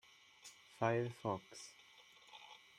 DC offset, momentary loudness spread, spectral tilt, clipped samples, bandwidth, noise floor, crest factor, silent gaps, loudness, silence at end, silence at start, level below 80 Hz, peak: under 0.1%; 23 LU; -5.5 dB/octave; under 0.1%; 14 kHz; -64 dBFS; 24 dB; none; -41 LUFS; 0.2 s; 0.45 s; -82 dBFS; -22 dBFS